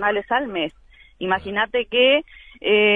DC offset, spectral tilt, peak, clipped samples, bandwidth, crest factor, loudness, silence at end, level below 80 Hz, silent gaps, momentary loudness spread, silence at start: under 0.1%; -6.5 dB/octave; -4 dBFS; under 0.1%; 4.5 kHz; 16 dB; -21 LUFS; 0 s; -52 dBFS; none; 11 LU; 0 s